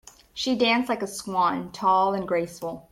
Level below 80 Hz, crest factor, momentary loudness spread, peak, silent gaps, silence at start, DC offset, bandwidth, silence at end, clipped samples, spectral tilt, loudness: -60 dBFS; 16 dB; 10 LU; -10 dBFS; none; 0.35 s; under 0.1%; 16 kHz; 0.1 s; under 0.1%; -4 dB/octave; -24 LUFS